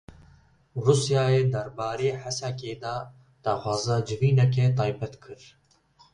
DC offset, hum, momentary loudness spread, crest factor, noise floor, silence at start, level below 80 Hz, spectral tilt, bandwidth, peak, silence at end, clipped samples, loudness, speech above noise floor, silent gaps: under 0.1%; none; 15 LU; 20 dB; -60 dBFS; 0.1 s; -56 dBFS; -6 dB/octave; 10.5 kHz; -6 dBFS; 0.8 s; under 0.1%; -26 LUFS; 35 dB; none